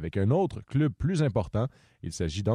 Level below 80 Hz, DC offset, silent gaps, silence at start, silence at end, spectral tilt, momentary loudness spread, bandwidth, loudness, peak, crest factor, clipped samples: -46 dBFS; under 0.1%; none; 0 s; 0 s; -7 dB/octave; 9 LU; 11.5 kHz; -28 LUFS; -12 dBFS; 14 dB; under 0.1%